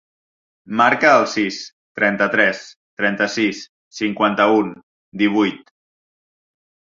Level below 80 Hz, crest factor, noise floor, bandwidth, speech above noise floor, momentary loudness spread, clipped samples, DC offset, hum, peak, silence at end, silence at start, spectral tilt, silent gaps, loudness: -64 dBFS; 18 dB; under -90 dBFS; 7.6 kHz; over 72 dB; 18 LU; under 0.1%; under 0.1%; none; -2 dBFS; 1.3 s; 0.7 s; -4.5 dB/octave; 1.72-1.95 s, 2.76-2.97 s, 3.69-3.91 s, 4.83-5.12 s; -17 LUFS